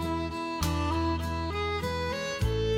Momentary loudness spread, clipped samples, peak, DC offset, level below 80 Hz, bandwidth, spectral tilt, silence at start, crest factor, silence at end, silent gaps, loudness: 3 LU; under 0.1%; -16 dBFS; under 0.1%; -38 dBFS; 16.5 kHz; -5.5 dB/octave; 0 s; 14 dB; 0 s; none; -31 LUFS